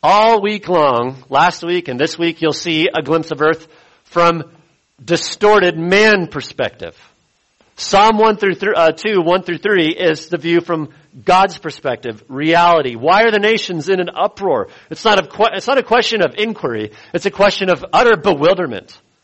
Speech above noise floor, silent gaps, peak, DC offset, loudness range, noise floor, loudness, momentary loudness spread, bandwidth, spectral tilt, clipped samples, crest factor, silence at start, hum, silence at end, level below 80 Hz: 44 dB; none; 0 dBFS; under 0.1%; 2 LU; -58 dBFS; -14 LUFS; 11 LU; 8.4 kHz; -4.5 dB/octave; under 0.1%; 14 dB; 0.05 s; none; 0.45 s; -50 dBFS